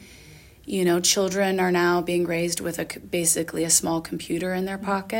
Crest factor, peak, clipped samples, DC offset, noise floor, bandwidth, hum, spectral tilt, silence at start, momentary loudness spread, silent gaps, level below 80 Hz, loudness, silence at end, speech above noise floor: 20 dB; -4 dBFS; under 0.1%; under 0.1%; -48 dBFS; 17 kHz; none; -3.5 dB/octave; 0 s; 9 LU; none; -56 dBFS; -23 LUFS; 0 s; 24 dB